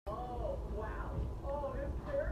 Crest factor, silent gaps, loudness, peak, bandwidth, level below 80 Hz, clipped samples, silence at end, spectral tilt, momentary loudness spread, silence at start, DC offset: 12 dB; none; -41 LUFS; -26 dBFS; 9.8 kHz; -44 dBFS; under 0.1%; 0 s; -8.5 dB/octave; 3 LU; 0.05 s; under 0.1%